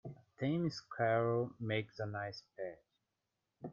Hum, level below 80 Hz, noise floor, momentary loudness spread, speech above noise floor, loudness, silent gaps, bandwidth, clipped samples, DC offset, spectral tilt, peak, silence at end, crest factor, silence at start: none; -76 dBFS; -88 dBFS; 14 LU; 51 dB; -38 LUFS; none; 7.4 kHz; under 0.1%; under 0.1%; -7 dB/octave; -22 dBFS; 0 s; 18 dB; 0.05 s